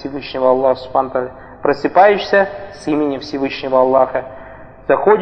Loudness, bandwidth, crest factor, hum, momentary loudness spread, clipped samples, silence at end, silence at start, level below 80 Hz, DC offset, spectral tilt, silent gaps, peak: -16 LUFS; 8.6 kHz; 16 dB; none; 14 LU; under 0.1%; 0 s; 0 s; -48 dBFS; under 0.1%; -6 dB/octave; none; 0 dBFS